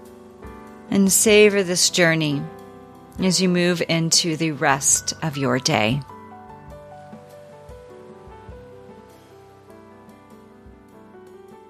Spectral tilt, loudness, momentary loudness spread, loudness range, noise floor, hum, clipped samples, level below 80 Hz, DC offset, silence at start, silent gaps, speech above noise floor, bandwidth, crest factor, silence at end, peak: -3.5 dB/octave; -18 LUFS; 27 LU; 9 LU; -47 dBFS; none; under 0.1%; -52 dBFS; under 0.1%; 0.05 s; none; 28 dB; 15 kHz; 20 dB; 0.15 s; -2 dBFS